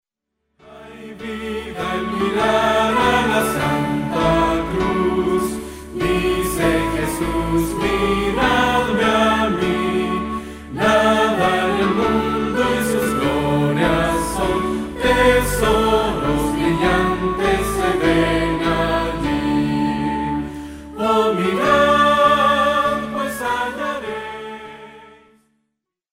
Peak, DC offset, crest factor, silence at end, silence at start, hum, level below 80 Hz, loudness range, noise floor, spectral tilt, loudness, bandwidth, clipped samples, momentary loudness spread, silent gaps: -2 dBFS; under 0.1%; 16 dB; 1.05 s; 0.65 s; none; -34 dBFS; 3 LU; -76 dBFS; -5 dB/octave; -18 LUFS; 16 kHz; under 0.1%; 11 LU; none